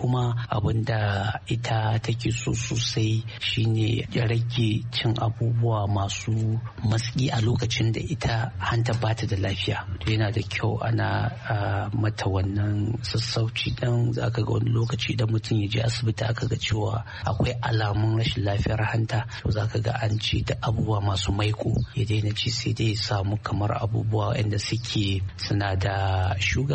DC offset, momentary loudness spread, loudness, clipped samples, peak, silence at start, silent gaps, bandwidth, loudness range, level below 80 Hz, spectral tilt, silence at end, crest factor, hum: under 0.1%; 3 LU; -26 LUFS; under 0.1%; -8 dBFS; 0 s; none; 8.6 kHz; 1 LU; -44 dBFS; -5.5 dB/octave; 0 s; 16 dB; none